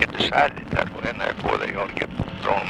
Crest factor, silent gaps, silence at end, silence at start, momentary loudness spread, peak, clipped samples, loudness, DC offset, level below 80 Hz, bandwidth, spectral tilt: 22 dB; none; 0 s; 0 s; 8 LU; -2 dBFS; under 0.1%; -24 LUFS; under 0.1%; -42 dBFS; 12 kHz; -5.5 dB/octave